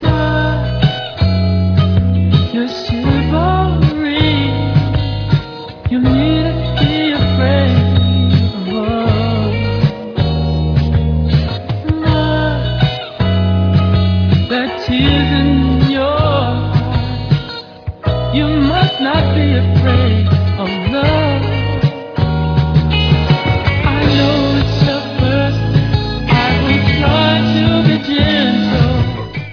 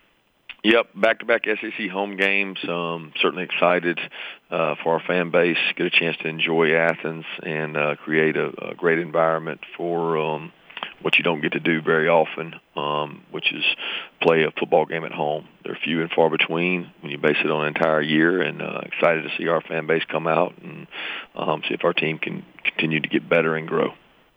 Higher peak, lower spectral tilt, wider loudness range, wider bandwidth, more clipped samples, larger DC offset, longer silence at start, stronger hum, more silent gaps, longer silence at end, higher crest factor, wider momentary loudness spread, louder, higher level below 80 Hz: first, 0 dBFS vs -4 dBFS; about the same, -8 dB/octave vs -7 dB/octave; about the same, 2 LU vs 3 LU; second, 5.4 kHz vs 8.8 kHz; neither; neither; second, 0 s vs 0.5 s; neither; neither; second, 0 s vs 0.45 s; second, 12 dB vs 20 dB; second, 5 LU vs 11 LU; first, -14 LUFS vs -22 LUFS; first, -24 dBFS vs -72 dBFS